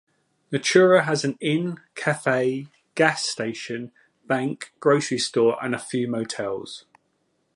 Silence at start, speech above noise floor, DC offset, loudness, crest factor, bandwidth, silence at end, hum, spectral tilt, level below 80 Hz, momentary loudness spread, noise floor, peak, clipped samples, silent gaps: 0.5 s; 48 dB; under 0.1%; -23 LUFS; 20 dB; 11.5 kHz; 0.75 s; none; -4.5 dB/octave; -72 dBFS; 15 LU; -70 dBFS; -4 dBFS; under 0.1%; none